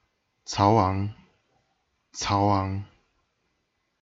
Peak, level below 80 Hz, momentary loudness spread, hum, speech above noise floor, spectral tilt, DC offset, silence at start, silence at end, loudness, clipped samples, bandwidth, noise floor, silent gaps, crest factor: -6 dBFS; -56 dBFS; 16 LU; none; 52 dB; -6 dB/octave; under 0.1%; 0.5 s; 1.2 s; -25 LUFS; under 0.1%; 7.8 kHz; -75 dBFS; none; 22 dB